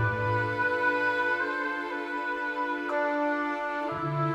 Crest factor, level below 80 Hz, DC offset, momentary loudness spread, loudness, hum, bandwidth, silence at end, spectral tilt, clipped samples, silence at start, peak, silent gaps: 14 dB; -60 dBFS; under 0.1%; 6 LU; -28 LUFS; none; 13 kHz; 0 s; -7 dB/octave; under 0.1%; 0 s; -14 dBFS; none